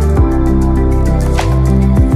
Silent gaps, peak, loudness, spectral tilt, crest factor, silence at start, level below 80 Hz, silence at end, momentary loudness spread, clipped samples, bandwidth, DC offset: none; 0 dBFS; -12 LUFS; -8 dB/octave; 8 dB; 0 s; -12 dBFS; 0 s; 2 LU; under 0.1%; 12.5 kHz; under 0.1%